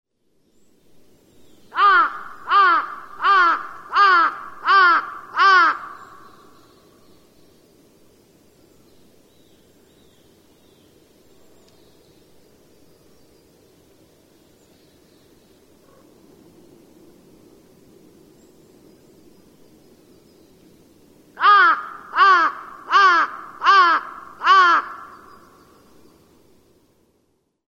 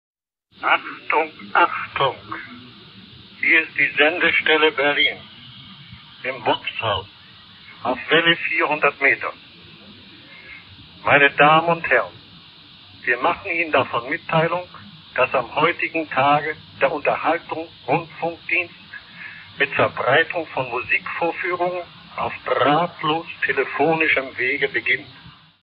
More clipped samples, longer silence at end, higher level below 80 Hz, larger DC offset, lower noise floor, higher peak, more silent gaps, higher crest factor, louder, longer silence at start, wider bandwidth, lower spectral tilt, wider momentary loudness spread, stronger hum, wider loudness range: neither; first, 2.65 s vs 0.35 s; second, -68 dBFS vs -60 dBFS; neither; first, -67 dBFS vs -46 dBFS; second, -4 dBFS vs 0 dBFS; neither; about the same, 18 dB vs 22 dB; first, -16 LUFS vs -19 LUFS; first, 1.75 s vs 0.6 s; first, 9.6 kHz vs 5.4 kHz; second, -1.5 dB/octave vs -8 dB/octave; about the same, 17 LU vs 18 LU; neither; about the same, 5 LU vs 5 LU